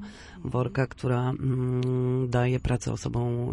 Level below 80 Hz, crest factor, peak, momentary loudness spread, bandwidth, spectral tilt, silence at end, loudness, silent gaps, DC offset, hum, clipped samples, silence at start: -46 dBFS; 16 dB; -12 dBFS; 5 LU; 10.5 kHz; -7.5 dB/octave; 0 s; -28 LUFS; none; under 0.1%; none; under 0.1%; 0 s